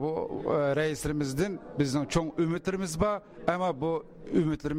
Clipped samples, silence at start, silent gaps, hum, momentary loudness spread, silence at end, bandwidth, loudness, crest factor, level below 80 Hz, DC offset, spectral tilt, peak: under 0.1%; 0 s; none; none; 5 LU; 0 s; 16 kHz; -30 LUFS; 18 dB; -48 dBFS; under 0.1%; -6 dB/octave; -12 dBFS